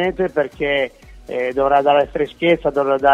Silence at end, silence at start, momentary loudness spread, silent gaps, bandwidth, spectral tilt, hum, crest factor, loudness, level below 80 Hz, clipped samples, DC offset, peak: 0 s; 0 s; 8 LU; none; 8.8 kHz; -6.5 dB/octave; none; 16 dB; -18 LUFS; -44 dBFS; under 0.1%; under 0.1%; -2 dBFS